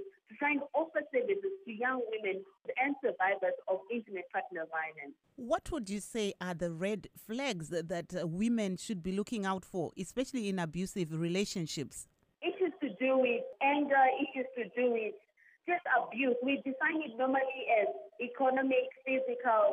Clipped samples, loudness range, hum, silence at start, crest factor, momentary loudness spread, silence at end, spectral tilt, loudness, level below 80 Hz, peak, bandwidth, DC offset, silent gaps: under 0.1%; 6 LU; none; 0 s; 18 dB; 9 LU; 0 s; -5 dB/octave; -34 LUFS; -66 dBFS; -16 dBFS; 15.5 kHz; under 0.1%; none